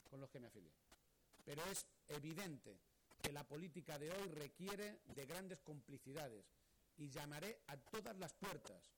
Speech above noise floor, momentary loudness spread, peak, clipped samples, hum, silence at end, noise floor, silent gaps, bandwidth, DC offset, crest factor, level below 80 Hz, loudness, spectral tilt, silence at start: 21 dB; 10 LU; -28 dBFS; under 0.1%; none; 0.05 s; -75 dBFS; none; 19.5 kHz; under 0.1%; 26 dB; -76 dBFS; -53 LUFS; -4 dB/octave; 0.05 s